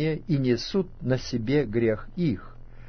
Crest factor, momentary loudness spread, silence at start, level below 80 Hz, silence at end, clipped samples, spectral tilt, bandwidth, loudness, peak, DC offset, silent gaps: 14 dB; 4 LU; 0 s; -44 dBFS; 0 s; under 0.1%; -7 dB/octave; 6.6 kHz; -27 LUFS; -12 dBFS; under 0.1%; none